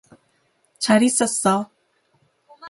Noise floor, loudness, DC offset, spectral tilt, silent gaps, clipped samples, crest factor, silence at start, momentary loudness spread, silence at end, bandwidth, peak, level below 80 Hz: -65 dBFS; -19 LUFS; under 0.1%; -3.5 dB/octave; none; under 0.1%; 20 dB; 0.8 s; 10 LU; 0 s; 11.5 kHz; -4 dBFS; -66 dBFS